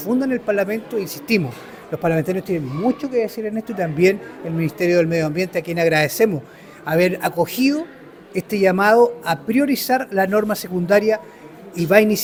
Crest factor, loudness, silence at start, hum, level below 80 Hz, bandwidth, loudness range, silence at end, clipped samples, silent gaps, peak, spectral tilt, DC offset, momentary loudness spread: 20 dB; -19 LUFS; 0 s; none; -56 dBFS; over 20 kHz; 4 LU; 0 s; under 0.1%; none; 0 dBFS; -5.5 dB/octave; under 0.1%; 10 LU